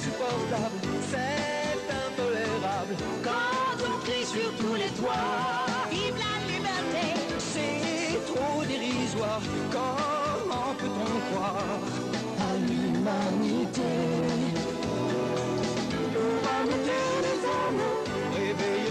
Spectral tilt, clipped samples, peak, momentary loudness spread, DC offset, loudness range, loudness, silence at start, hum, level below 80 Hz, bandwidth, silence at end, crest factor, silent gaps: -4.5 dB/octave; under 0.1%; -16 dBFS; 3 LU; under 0.1%; 1 LU; -29 LUFS; 0 s; none; -56 dBFS; 13.5 kHz; 0 s; 12 dB; none